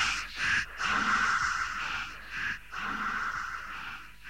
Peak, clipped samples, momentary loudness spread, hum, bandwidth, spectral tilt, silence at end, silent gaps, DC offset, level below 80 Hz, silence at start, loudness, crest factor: -16 dBFS; under 0.1%; 12 LU; none; 16 kHz; -1 dB/octave; 0 s; none; 0.3%; -54 dBFS; 0 s; -31 LUFS; 16 dB